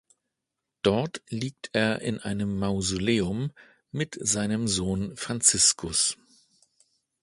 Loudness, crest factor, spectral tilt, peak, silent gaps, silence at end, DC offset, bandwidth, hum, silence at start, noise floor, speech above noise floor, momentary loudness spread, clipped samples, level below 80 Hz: -26 LUFS; 22 dB; -3 dB/octave; -6 dBFS; none; 1.1 s; under 0.1%; 11.5 kHz; none; 0.85 s; -85 dBFS; 58 dB; 13 LU; under 0.1%; -52 dBFS